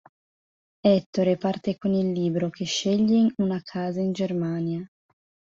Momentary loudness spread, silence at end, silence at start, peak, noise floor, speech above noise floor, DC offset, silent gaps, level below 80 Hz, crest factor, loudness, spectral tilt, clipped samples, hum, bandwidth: 8 LU; 0.65 s; 0.85 s; -8 dBFS; under -90 dBFS; over 66 dB; under 0.1%; 1.06-1.13 s; -64 dBFS; 18 dB; -25 LUFS; -6.5 dB/octave; under 0.1%; none; 7.6 kHz